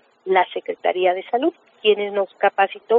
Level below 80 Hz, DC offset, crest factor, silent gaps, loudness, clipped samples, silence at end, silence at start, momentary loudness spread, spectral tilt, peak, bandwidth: -80 dBFS; under 0.1%; 16 dB; none; -21 LUFS; under 0.1%; 0 s; 0.25 s; 5 LU; -1 dB/octave; -4 dBFS; 4.3 kHz